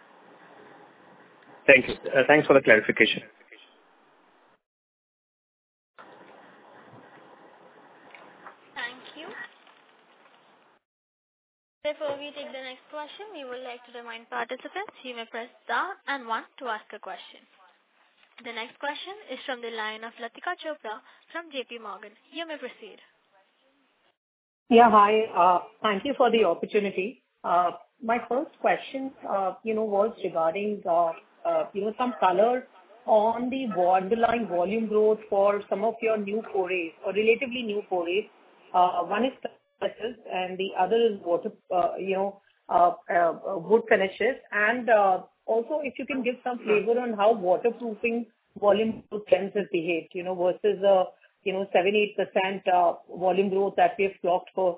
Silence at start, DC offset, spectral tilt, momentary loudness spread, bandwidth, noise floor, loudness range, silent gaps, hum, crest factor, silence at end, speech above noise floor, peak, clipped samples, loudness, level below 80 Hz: 1.65 s; under 0.1%; -8.5 dB/octave; 16 LU; 4 kHz; -68 dBFS; 17 LU; 4.66-5.94 s, 10.85-11.81 s, 24.17-24.66 s; none; 26 dB; 0 s; 42 dB; -2 dBFS; under 0.1%; -25 LUFS; -68 dBFS